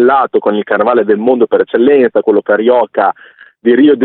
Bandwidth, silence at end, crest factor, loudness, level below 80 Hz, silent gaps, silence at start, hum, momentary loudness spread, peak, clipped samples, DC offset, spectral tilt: 4.2 kHz; 0 s; 10 dB; -11 LUFS; -58 dBFS; none; 0 s; none; 5 LU; 0 dBFS; under 0.1%; under 0.1%; -10.5 dB/octave